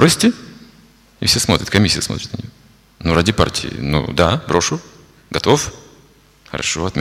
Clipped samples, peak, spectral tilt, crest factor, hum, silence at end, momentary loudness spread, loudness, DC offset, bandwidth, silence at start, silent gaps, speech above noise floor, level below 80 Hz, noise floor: under 0.1%; 0 dBFS; -4 dB/octave; 18 dB; none; 0 s; 13 LU; -17 LUFS; under 0.1%; 16 kHz; 0 s; none; 33 dB; -38 dBFS; -49 dBFS